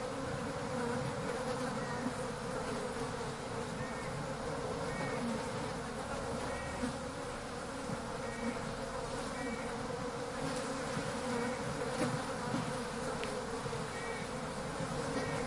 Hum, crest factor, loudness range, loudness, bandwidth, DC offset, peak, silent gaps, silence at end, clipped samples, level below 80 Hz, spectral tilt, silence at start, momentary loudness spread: none; 18 dB; 2 LU; -39 LUFS; 11.5 kHz; under 0.1%; -22 dBFS; none; 0 s; under 0.1%; -56 dBFS; -4.5 dB/octave; 0 s; 4 LU